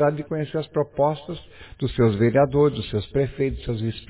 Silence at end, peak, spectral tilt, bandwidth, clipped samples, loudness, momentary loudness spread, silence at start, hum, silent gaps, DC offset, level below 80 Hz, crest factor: 0.05 s; -6 dBFS; -11.5 dB/octave; 4 kHz; under 0.1%; -23 LUFS; 11 LU; 0 s; none; none; under 0.1%; -42 dBFS; 16 dB